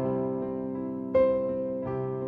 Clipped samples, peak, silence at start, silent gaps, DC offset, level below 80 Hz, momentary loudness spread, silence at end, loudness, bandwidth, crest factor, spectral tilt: under 0.1%; -12 dBFS; 0 s; none; under 0.1%; -56 dBFS; 9 LU; 0 s; -29 LUFS; 4.6 kHz; 16 dB; -11 dB/octave